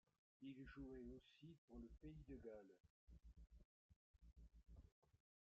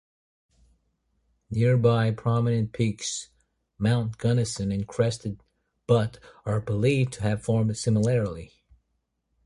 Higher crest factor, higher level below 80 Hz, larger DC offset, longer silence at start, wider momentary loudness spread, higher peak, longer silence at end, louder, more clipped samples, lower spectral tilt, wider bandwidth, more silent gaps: about the same, 16 dB vs 18 dB; second, -70 dBFS vs -52 dBFS; neither; second, 0.4 s vs 1.5 s; about the same, 9 LU vs 11 LU; second, -46 dBFS vs -8 dBFS; second, 0.3 s vs 1 s; second, -62 LUFS vs -26 LUFS; neither; about the same, -7 dB/octave vs -6.5 dB/octave; second, 6.6 kHz vs 11.5 kHz; first, 1.58-1.68 s, 2.80-2.84 s, 2.90-3.07 s, 3.65-3.89 s, 3.96-4.14 s, 4.92-5.02 s vs none